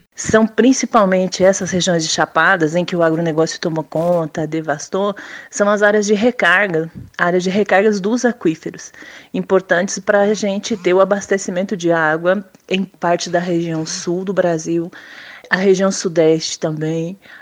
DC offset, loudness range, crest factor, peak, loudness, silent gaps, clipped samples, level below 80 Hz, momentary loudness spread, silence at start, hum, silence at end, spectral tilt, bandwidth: under 0.1%; 3 LU; 16 dB; 0 dBFS; -16 LUFS; none; under 0.1%; -56 dBFS; 9 LU; 0.2 s; none; 0.05 s; -4.5 dB/octave; 15 kHz